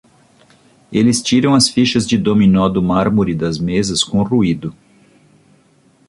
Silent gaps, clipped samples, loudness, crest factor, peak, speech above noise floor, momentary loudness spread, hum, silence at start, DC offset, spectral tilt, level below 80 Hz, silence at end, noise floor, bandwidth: none; under 0.1%; -14 LUFS; 16 dB; 0 dBFS; 39 dB; 7 LU; none; 0.9 s; under 0.1%; -5 dB/octave; -42 dBFS; 1.35 s; -53 dBFS; 11.5 kHz